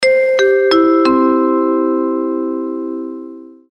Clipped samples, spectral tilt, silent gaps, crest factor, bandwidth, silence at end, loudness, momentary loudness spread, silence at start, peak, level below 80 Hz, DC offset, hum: under 0.1%; -4 dB/octave; none; 12 dB; 8.8 kHz; 0.3 s; -14 LUFS; 14 LU; 0 s; -2 dBFS; -58 dBFS; under 0.1%; none